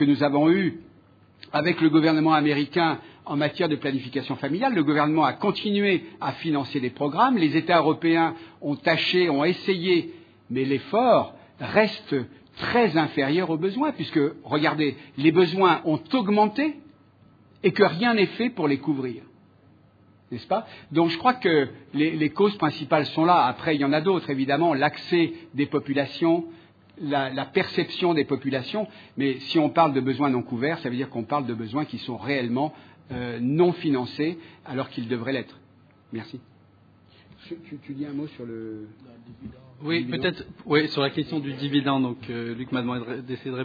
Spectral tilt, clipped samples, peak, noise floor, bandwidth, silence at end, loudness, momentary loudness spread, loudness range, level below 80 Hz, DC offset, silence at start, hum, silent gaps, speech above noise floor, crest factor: -8 dB/octave; under 0.1%; -4 dBFS; -56 dBFS; 5 kHz; 0 s; -24 LUFS; 14 LU; 7 LU; -66 dBFS; under 0.1%; 0 s; none; none; 32 dB; 20 dB